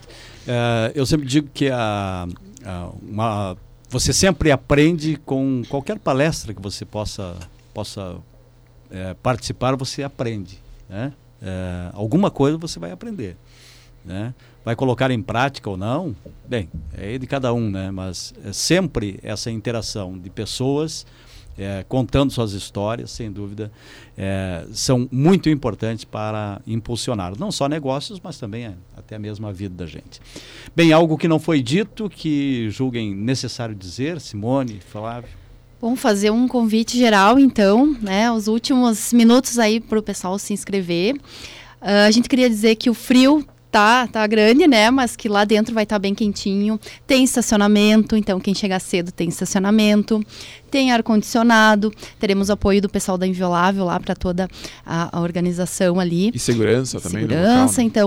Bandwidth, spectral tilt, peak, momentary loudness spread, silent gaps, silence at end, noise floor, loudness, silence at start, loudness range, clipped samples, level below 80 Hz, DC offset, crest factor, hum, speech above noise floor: 16.5 kHz; -5 dB/octave; -6 dBFS; 17 LU; none; 0 s; -49 dBFS; -19 LUFS; 0.1 s; 10 LU; under 0.1%; -42 dBFS; under 0.1%; 14 dB; none; 30 dB